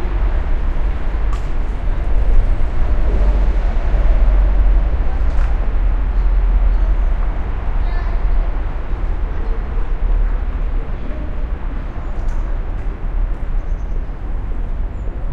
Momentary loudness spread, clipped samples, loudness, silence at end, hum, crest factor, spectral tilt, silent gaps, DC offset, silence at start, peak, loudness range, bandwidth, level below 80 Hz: 9 LU; under 0.1%; -22 LUFS; 0 s; none; 14 dB; -8.5 dB/octave; none; under 0.1%; 0 s; -2 dBFS; 7 LU; 4.2 kHz; -16 dBFS